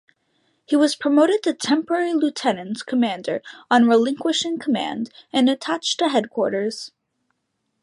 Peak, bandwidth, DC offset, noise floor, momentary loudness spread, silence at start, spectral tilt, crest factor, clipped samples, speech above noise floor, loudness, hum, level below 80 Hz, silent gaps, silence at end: -4 dBFS; 11.5 kHz; under 0.1%; -74 dBFS; 11 LU; 0.7 s; -3.5 dB/octave; 16 dB; under 0.1%; 54 dB; -21 LUFS; none; -72 dBFS; none; 0.95 s